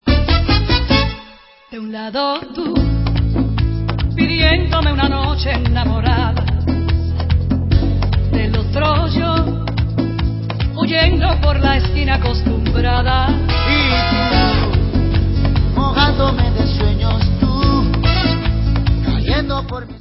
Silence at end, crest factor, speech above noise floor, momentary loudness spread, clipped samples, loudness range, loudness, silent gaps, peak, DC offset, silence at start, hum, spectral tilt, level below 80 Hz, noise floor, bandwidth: 0 s; 14 dB; 28 dB; 6 LU; under 0.1%; 2 LU; -16 LUFS; none; 0 dBFS; under 0.1%; 0.05 s; none; -10 dB/octave; -18 dBFS; -42 dBFS; 5.8 kHz